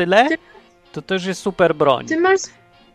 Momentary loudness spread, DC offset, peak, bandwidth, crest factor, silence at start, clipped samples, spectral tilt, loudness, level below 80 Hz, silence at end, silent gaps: 16 LU; under 0.1%; 0 dBFS; 12.5 kHz; 18 dB; 0 s; under 0.1%; -4.5 dB/octave; -18 LUFS; -56 dBFS; 0.45 s; none